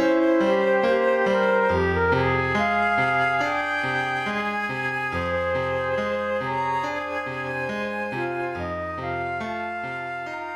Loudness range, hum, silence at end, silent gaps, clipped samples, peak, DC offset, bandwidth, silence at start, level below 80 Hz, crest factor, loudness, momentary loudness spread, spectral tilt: 7 LU; none; 0 s; none; under 0.1%; -10 dBFS; under 0.1%; 12 kHz; 0 s; -50 dBFS; 14 dB; -24 LUFS; 9 LU; -6.5 dB/octave